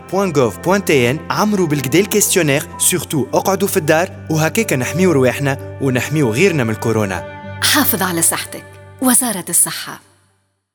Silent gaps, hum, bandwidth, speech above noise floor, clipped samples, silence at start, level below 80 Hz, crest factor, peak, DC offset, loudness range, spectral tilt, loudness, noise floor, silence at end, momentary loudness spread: none; none; over 20 kHz; 46 dB; under 0.1%; 0 s; -56 dBFS; 16 dB; 0 dBFS; under 0.1%; 1 LU; -4 dB/octave; -15 LUFS; -62 dBFS; 0.75 s; 7 LU